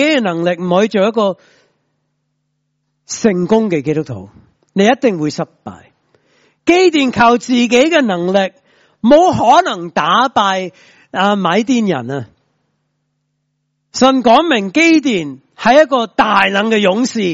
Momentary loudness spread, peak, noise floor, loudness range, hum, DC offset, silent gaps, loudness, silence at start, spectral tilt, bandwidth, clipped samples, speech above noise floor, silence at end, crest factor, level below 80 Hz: 14 LU; 0 dBFS; -68 dBFS; 7 LU; none; under 0.1%; none; -13 LUFS; 0 s; -5 dB/octave; 8 kHz; under 0.1%; 56 dB; 0 s; 14 dB; -52 dBFS